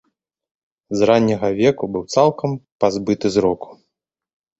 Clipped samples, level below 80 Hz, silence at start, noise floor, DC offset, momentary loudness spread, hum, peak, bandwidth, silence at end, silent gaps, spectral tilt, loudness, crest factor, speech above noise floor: under 0.1%; -52 dBFS; 0.9 s; -78 dBFS; under 0.1%; 10 LU; none; -2 dBFS; 8 kHz; 0.85 s; 2.72-2.79 s; -6 dB/octave; -18 LUFS; 18 dB; 60 dB